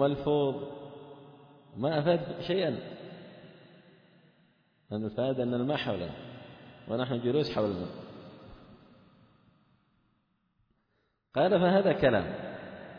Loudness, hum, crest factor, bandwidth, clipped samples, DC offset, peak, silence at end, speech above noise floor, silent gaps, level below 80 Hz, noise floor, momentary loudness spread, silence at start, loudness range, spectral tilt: -30 LUFS; none; 20 dB; 5.4 kHz; under 0.1%; under 0.1%; -12 dBFS; 0 s; 47 dB; none; -62 dBFS; -76 dBFS; 24 LU; 0 s; 7 LU; -8.5 dB/octave